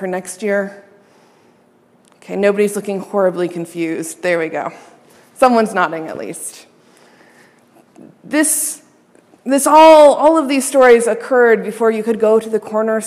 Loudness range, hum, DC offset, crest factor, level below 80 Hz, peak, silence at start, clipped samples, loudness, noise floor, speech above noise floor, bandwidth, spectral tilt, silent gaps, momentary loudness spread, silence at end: 10 LU; none; under 0.1%; 14 dB; -60 dBFS; 0 dBFS; 0 s; under 0.1%; -14 LUFS; -52 dBFS; 39 dB; 15.5 kHz; -3.5 dB/octave; none; 17 LU; 0 s